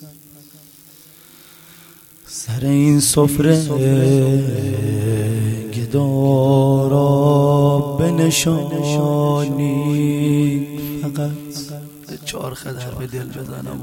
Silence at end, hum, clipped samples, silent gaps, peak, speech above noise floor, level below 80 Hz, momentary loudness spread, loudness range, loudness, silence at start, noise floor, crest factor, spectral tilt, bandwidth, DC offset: 0 s; none; under 0.1%; none; 0 dBFS; 28 dB; -46 dBFS; 15 LU; 6 LU; -17 LUFS; 0 s; -45 dBFS; 16 dB; -6 dB/octave; 17 kHz; under 0.1%